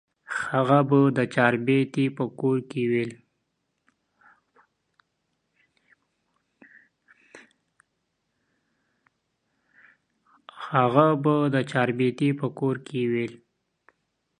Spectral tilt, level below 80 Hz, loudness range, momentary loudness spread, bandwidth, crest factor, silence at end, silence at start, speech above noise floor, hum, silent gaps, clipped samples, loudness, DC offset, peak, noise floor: -7.5 dB/octave; -72 dBFS; 9 LU; 9 LU; 10.5 kHz; 24 dB; 1.05 s; 0.3 s; 54 dB; none; none; under 0.1%; -24 LUFS; under 0.1%; -2 dBFS; -77 dBFS